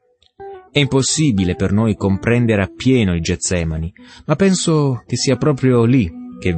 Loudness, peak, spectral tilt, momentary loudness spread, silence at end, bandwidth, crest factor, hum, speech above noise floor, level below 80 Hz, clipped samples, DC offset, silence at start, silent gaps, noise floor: -16 LUFS; -2 dBFS; -5.5 dB/octave; 9 LU; 0 s; 8.8 kHz; 14 dB; none; 22 dB; -38 dBFS; under 0.1%; under 0.1%; 0.4 s; none; -38 dBFS